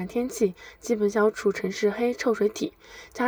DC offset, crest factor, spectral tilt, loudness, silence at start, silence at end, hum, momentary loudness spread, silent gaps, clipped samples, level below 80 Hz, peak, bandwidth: under 0.1%; 14 dB; -5 dB/octave; -26 LUFS; 0 s; 0 s; none; 12 LU; none; under 0.1%; -60 dBFS; -12 dBFS; over 20 kHz